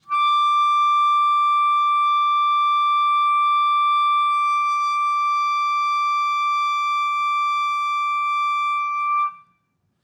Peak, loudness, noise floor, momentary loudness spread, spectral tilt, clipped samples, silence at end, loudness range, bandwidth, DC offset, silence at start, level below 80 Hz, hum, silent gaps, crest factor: -12 dBFS; -19 LUFS; -69 dBFS; 4 LU; 3 dB/octave; under 0.1%; 0.65 s; 3 LU; 8.8 kHz; under 0.1%; 0.1 s; -84 dBFS; none; none; 8 dB